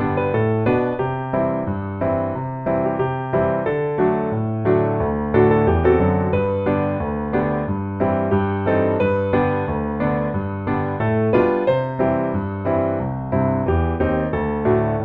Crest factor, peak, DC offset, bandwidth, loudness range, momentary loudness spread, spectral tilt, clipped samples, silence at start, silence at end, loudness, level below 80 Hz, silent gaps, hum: 18 dB; -2 dBFS; under 0.1%; 4.6 kHz; 3 LU; 6 LU; -11 dB/octave; under 0.1%; 0 s; 0 s; -20 LUFS; -36 dBFS; none; none